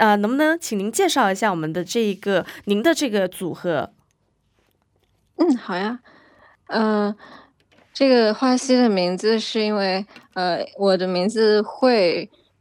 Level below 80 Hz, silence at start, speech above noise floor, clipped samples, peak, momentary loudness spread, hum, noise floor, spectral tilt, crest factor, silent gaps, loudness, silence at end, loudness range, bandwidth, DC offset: -70 dBFS; 0 s; 47 dB; under 0.1%; -4 dBFS; 10 LU; none; -67 dBFS; -4.5 dB/octave; 16 dB; none; -20 LUFS; 0.35 s; 6 LU; 19 kHz; under 0.1%